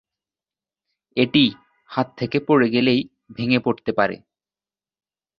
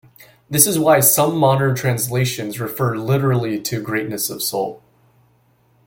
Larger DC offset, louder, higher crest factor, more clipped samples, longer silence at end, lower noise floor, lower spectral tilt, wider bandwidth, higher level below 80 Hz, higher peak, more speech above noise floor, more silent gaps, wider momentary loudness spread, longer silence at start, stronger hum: neither; second, -20 LUFS vs -17 LUFS; about the same, 20 dB vs 20 dB; neither; first, 1.25 s vs 1.1 s; first, under -90 dBFS vs -58 dBFS; first, -8 dB/octave vs -4.5 dB/octave; second, 5.8 kHz vs 17 kHz; about the same, -60 dBFS vs -56 dBFS; about the same, -2 dBFS vs 0 dBFS; first, over 71 dB vs 40 dB; neither; about the same, 12 LU vs 11 LU; first, 1.15 s vs 0.2 s; neither